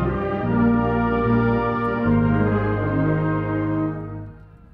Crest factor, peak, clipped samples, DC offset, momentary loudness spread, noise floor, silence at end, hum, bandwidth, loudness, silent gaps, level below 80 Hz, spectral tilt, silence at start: 14 dB; -6 dBFS; under 0.1%; under 0.1%; 8 LU; -41 dBFS; 0.3 s; none; 5 kHz; -21 LUFS; none; -36 dBFS; -11 dB/octave; 0 s